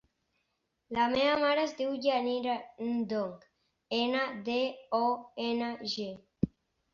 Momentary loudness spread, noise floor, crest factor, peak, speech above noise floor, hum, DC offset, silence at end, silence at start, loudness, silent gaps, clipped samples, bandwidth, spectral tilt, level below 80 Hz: 9 LU; -80 dBFS; 20 dB; -12 dBFS; 49 dB; none; under 0.1%; 0.45 s; 0.9 s; -32 LUFS; none; under 0.1%; 7.2 kHz; -5.5 dB/octave; -64 dBFS